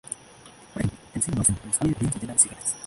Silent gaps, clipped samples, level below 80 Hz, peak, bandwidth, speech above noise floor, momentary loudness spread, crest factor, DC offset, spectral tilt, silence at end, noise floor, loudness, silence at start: none; under 0.1%; -46 dBFS; -4 dBFS; 12 kHz; 24 dB; 15 LU; 22 dB; under 0.1%; -4.5 dB/octave; 0 s; -49 dBFS; -24 LUFS; 0.05 s